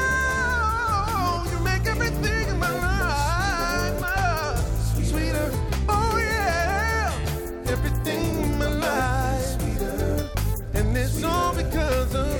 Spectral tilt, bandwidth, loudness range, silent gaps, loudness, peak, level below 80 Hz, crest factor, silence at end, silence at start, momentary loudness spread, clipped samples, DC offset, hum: -5 dB/octave; 18 kHz; 1 LU; none; -24 LUFS; -10 dBFS; -28 dBFS; 14 dB; 0 s; 0 s; 4 LU; under 0.1%; under 0.1%; none